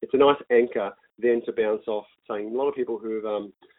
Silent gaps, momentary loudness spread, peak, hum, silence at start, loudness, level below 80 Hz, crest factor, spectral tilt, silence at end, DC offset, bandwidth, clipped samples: none; 13 LU; -6 dBFS; none; 0 s; -25 LUFS; -68 dBFS; 18 dB; -9.5 dB/octave; 0.25 s; under 0.1%; 4 kHz; under 0.1%